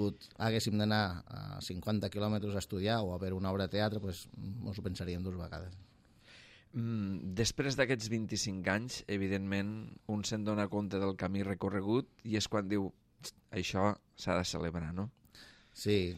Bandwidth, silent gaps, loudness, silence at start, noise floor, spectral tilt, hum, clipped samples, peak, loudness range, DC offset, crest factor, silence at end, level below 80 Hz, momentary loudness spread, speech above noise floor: 15 kHz; none; -36 LUFS; 0 s; -61 dBFS; -5 dB/octave; none; under 0.1%; -16 dBFS; 4 LU; under 0.1%; 20 dB; 0 s; -62 dBFS; 12 LU; 25 dB